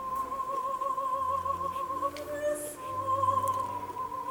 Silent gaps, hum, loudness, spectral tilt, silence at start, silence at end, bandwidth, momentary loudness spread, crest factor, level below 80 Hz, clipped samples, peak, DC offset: none; none; -32 LUFS; -4.5 dB/octave; 0 s; 0 s; over 20 kHz; 8 LU; 18 dB; -62 dBFS; under 0.1%; -14 dBFS; under 0.1%